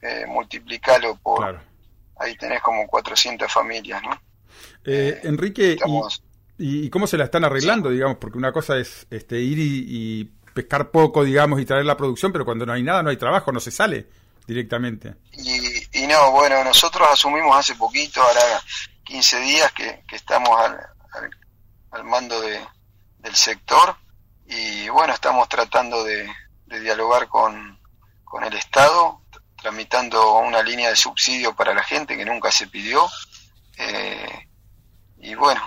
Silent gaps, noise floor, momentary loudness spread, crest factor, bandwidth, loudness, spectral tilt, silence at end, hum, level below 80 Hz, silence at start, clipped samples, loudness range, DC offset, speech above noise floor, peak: none; -52 dBFS; 16 LU; 16 dB; 16 kHz; -19 LUFS; -3 dB/octave; 0 s; none; -52 dBFS; 0.05 s; under 0.1%; 7 LU; under 0.1%; 33 dB; -4 dBFS